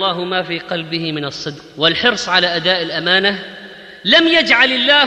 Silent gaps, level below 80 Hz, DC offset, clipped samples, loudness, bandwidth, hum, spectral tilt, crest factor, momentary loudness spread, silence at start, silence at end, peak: none; -54 dBFS; under 0.1%; under 0.1%; -14 LUFS; 10.5 kHz; none; -3.5 dB/octave; 14 dB; 16 LU; 0 s; 0 s; -2 dBFS